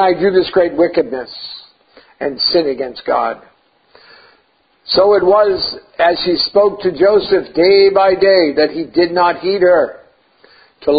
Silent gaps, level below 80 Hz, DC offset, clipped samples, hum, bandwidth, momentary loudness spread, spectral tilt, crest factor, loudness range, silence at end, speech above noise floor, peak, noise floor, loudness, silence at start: none; -50 dBFS; under 0.1%; under 0.1%; none; 5 kHz; 12 LU; -9 dB/octave; 14 dB; 8 LU; 0 s; 44 dB; 0 dBFS; -56 dBFS; -13 LUFS; 0 s